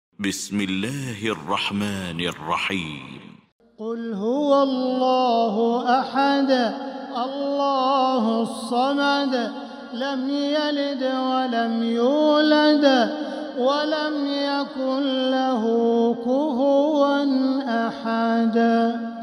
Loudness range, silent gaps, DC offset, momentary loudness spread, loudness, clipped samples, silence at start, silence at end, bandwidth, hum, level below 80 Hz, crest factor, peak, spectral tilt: 5 LU; 3.52-3.59 s; under 0.1%; 9 LU; -22 LUFS; under 0.1%; 0.2 s; 0 s; 14.5 kHz; none; -68 dBFS; 16 dB; -6 dBFS; -5 dB/octave